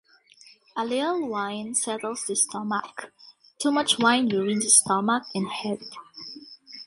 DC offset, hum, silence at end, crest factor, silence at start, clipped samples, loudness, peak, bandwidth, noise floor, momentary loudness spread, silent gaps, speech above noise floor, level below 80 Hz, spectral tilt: under 0.1%; none; 0 s; 24 dB; 0.75 s; under 0.1%; -24 LUFS; -2 dBFS; 11.5 kHz; -54 dBFS; 22 LU; none; 29 dB; -72 dBFS; -2 dB/octave